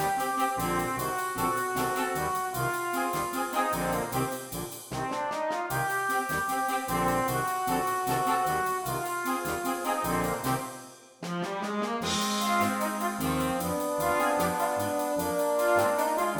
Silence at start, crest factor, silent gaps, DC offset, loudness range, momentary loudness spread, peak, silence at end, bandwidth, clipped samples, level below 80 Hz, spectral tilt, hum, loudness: 0 s; 16 dB; none; under 0.1%; 3 LU; 6 LU; -14 dBFS; 0 s; 19.5 kHz; under 0.1%; -54 dBFS; -4 dB/octave; none; -29 LUFS